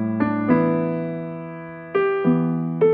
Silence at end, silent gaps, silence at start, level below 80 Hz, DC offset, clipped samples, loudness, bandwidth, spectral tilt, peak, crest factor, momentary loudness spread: 0 s; none; 0 s; -62 dBFS; under 0.1%; under 0.1%; -22 LUFS; 4.7 kHz; -11.5 dB/octave; -4 dBFS; 16 dB; 13 LU